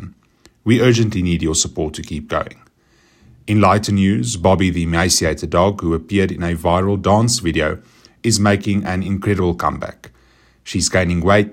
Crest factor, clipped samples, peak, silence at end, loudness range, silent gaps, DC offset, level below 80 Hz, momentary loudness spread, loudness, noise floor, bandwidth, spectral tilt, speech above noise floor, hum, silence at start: 16 dB; under 0.1%; 0 dBFS; 0 s; 3 LU; none; under 0.1%; -40 dBFS; 10 LU; -17 LUFS; -55 dBFS; 16 kHz; -5 dB/octave; 39 dB; none; 0 s